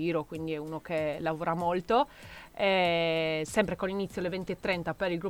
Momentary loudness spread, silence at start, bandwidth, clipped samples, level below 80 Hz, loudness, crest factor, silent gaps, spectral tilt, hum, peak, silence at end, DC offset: 9 LU; 0 s; 18 kHz; under 0.1%; -56 dBFS; -30 LUFS; 18 dB; none; -5.5 dB/octave; none; -12 dBFS; 0 s; under 0.1%